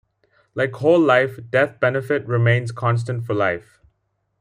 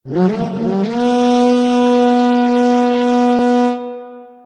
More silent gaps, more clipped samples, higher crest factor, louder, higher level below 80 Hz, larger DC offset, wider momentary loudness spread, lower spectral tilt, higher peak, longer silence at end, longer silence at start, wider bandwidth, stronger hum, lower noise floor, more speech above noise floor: neither; neither; first, 18 dB vs 12 dB; second, -19 LUFS vs -14 LUFS; about the same, -60 dBFS vs -56 dBFS; neither; first, 9 LU vs 6 LU; about the same, -7.5 dB/octave vs -6.5 dB/octave; about the same, -2 dBFS vs -2 dBFS; first, 0.8 s vs 0.2 s; first, 0.55 s vs 0.05 s; first, 10.5 kHz vs 9.4 kHz; neither; first, -71 dBFS vs -33 dBFS; first, 52 dB vs 17 dB